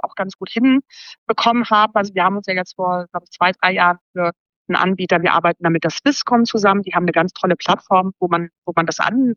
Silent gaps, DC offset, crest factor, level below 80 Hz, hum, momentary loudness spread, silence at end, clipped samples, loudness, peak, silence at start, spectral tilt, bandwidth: 0.35-0.39 s, 1.18-1.26 s, 4.01-4.14 s, 4.40-4.65 s, 8.58-8.62 s; under 0.1%; 16 dB; -64 dBFS; none; 8 LU; 0 s; under 0.1%; -17 LUFS; -2 dBFS; 0.05 s; -5 dB/octave; 7.2 kHz